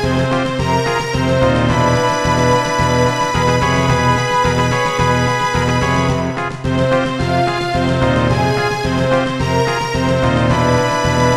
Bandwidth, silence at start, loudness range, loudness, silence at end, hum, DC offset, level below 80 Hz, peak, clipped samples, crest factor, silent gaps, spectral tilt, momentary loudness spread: 14.5 kHz; 0 s; 2 LU; -15 LUFS; 0 s; none; 0.5%; -32 dBFS; -2 dBFS; under 0.1%; 14 dB; none; -5.5 dB/octave; 3 LU